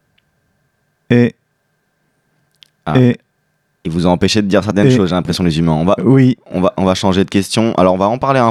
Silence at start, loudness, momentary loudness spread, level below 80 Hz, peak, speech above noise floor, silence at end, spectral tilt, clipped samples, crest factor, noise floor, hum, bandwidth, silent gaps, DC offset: 1.1 s; -13 LUFS; 5 LU; -42 dBFS; 0 dBFS; 52 dB; 0 s; -6.5 dB/octave; under 0.1%; 14 dB; -64 dBFS; none; 13 kHz; none; under 0.1%